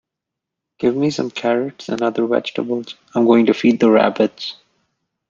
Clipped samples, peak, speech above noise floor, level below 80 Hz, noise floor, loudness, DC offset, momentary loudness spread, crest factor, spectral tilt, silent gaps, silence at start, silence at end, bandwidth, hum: under 0.1%; -2 dBFS; 66 dB; -64 dBFS; -83 dBFS; -17 LUFS; under 0.1%; 11 LU; 16 dB; -6 dB/octave; none; 0.8 s; 0.75 s; 7.6 kHz; none